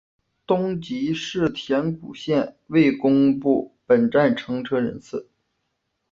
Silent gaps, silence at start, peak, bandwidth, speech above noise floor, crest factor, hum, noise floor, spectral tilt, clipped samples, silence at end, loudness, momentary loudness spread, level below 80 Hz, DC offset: none; 0.5 s; -6 dBFS; 7.4 kHz; 54 dB; 16 dB; none; -75 dBFS; -7 dB/octave; under 0.1%; 0.9 s; -22 LUFS; 10 LU; -58 dBFS; under 0.1%